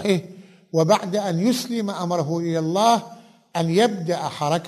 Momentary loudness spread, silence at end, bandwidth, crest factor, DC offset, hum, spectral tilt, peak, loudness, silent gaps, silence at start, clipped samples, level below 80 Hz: 7 LU; 0 s; 13.5 kHz; 18 dB; under 0.1%; none; -5.5 dB/octave; -4 dBFS; -22 LUFS; none; 0 s; under 0.1%; -66 dBFS